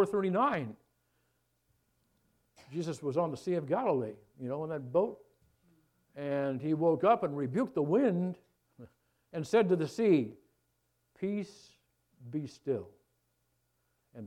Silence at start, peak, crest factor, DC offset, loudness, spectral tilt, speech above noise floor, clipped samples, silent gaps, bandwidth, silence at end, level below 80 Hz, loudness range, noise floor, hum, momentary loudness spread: 0 s; -14 dBFS; 20 dB; under 0.1%; -32 LUFS; -7.5 dB/octave; 46 dB; under 0.1%; none; 13 kHz; 0 s; -76 dBFS; 8 LU; -78 dBFS; none; 14 LU